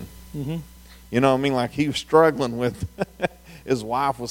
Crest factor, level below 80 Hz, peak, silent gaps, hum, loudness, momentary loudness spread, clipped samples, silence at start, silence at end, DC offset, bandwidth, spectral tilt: 20 dB; -48 dBFS; -2 dBFS; none; none; -23 LUFS; 14 LU; under 0.1%; 0 s; 0 s; under 0.1%; 17 kHz; -6 dB/octave